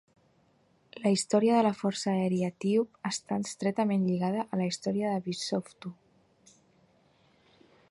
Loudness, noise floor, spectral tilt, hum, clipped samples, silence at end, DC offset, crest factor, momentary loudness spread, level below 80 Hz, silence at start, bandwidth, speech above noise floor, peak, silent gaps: -29 LUFS; -67 dBFS; -5.5 dB/octave; none; under 0.1%; 1.95 s; under 0.1%; 18 dB; 9 LU; -74 dBFS; 0.95 s; 11.5 kHz; 38 dB; -12 dBFS; none